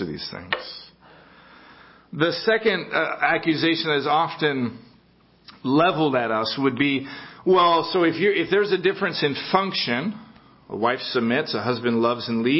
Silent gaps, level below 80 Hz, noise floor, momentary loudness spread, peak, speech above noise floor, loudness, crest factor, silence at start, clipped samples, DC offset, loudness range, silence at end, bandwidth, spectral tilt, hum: none; -62 dBFS; -57 dBFS; 10 LU; -2 dBFS; 35 dB; -22 LUFS; 22 dB; 0 s; under 0.1%; under 0.1%; 3 LU; 0 s; 5.8 kHz; -9 dB/octave; none